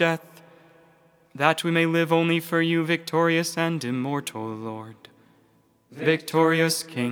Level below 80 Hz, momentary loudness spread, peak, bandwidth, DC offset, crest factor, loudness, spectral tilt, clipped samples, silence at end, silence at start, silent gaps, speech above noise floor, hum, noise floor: -80 dBFS; 12 LU; -2 dBFS; over 20 kHz; under 0.1%; 22 dB; -23 LUFS; -5 dB/octave; under 0.1%; 0 s; 0 s; none; 38 dB; none; -62 dBFS